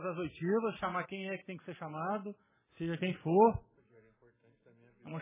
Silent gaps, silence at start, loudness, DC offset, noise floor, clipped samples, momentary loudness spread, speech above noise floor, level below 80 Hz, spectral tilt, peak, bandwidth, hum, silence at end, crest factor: none; 0 s; -34 LUFS; under 0.1%; -68 dBFS; under 0.1%; 17 LU; 34 dB; -62 dBFS; -6 dB/octave; -14 dBFS; 3.8 kHz; none; 0 s; 22 dB